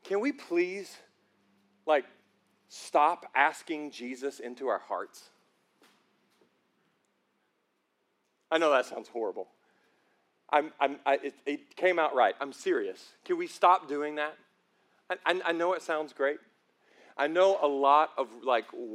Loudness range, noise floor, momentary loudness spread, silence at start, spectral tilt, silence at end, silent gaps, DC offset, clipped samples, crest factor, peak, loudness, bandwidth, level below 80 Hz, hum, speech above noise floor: 10 LU; -77 dBFS; 14 LU; 0.05 s; -3.5 dB/octave; 0 s; none; under 0.1%; under 0.1%; 24 dB; -8 dBFS; -29 LUFS; 13.5 kHz; under -90 dBFS; none; 47 dB